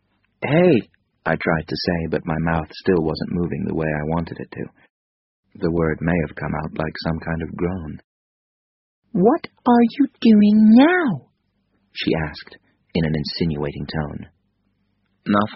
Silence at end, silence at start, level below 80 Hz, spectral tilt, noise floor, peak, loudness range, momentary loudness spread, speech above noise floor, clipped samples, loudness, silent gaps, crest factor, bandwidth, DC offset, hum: 0 s; 0.4 s; -44 dBFS; -6 dB/octave; -67 dBFS; -2 dBFS; 9 LU; 17 LU; 48 dB; under 0.1%; -20 LUFS; 4.90-5.43 s, 8.04-9.02 s; 18 dB; 6 kHz; under 0.1%; none